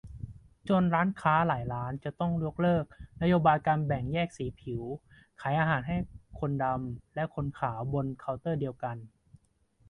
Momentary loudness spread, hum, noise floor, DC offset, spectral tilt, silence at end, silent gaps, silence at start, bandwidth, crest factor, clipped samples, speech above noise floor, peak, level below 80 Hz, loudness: 14 LU; none; -67 dBFS; under 0.1%; -8.5 dB/octave; 0.85 s; none; 0.05 s; 10 kHz; 20 dB; under 0.1%; 37 dB; -10 dBFS; -52 dBFS; -30 LUFS